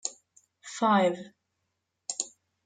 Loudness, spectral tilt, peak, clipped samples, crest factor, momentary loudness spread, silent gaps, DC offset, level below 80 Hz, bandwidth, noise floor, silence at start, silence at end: -28 LUFS; -3.5 dB/octave; -10 dBFS; under 0.1%; 22 dB; 21 LU; none; under 0.1%; -82 dBFS; 9.6 kHz; -81 dBFS; 0.05 s; 0.35 s